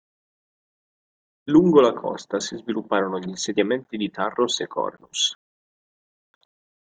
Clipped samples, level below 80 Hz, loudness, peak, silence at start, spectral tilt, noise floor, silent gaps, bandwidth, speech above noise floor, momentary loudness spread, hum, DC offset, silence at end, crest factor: under 0.1%; -64 dBFS; -22 LUFS; -4 dBFS; 1.45 s; -4.5 dB/octave; under -90 dBFS; none; 9.4 kHz; over 68 dB; 13 LU; none; under 0.1%; 1.5 s; 22 dB